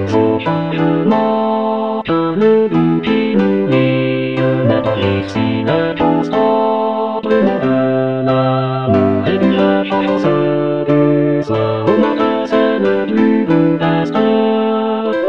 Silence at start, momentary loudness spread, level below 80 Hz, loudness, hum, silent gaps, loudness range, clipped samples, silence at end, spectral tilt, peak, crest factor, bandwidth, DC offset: 0 s; 4 LU; -50 dBFS; -14 LUFS; none; none; 1 LU; under 0.1%; 0 s; -8.5 dB/octave; 0 dBFS; 12 dB; 7.2 kHz; 0.6%